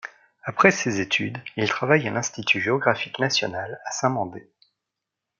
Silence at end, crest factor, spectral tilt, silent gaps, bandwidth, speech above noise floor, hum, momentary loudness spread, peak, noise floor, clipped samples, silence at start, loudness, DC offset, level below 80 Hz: 1 s; 22 dB; -4 dB/octave; none; 7.6 kHz; 61 dB; none; 13 LU; -2 dBFS; -84 dBFS; under 0.1%; 0.05 s; -23 LUFS; under 0.1%; -68 dBFS